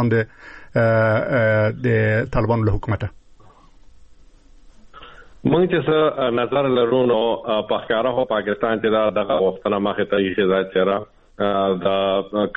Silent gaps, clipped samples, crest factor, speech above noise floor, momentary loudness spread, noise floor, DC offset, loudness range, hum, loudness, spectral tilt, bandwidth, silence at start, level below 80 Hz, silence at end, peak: none; under 0.1%; 16 dB; 28 dB; 5 LU; -47 dBFS; under 0.1%; 5 LU; none; -20 LUFS; -9 dB/octave; 5.6 kHz; 0 s; -40 dBFS; 0.05 s; -4 dBFS